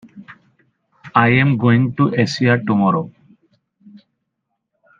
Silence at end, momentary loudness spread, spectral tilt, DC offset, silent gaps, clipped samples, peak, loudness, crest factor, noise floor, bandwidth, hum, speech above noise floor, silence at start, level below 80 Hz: 1 s; 5 LU; -7 dB/octave; under 0.1%; none; under 0.1%; 0 dBFS; -16 LUFS; 18 dB; -75 dBFS; 7.6 kHz; none; 60 dB; 0.15 s; -56 dBFS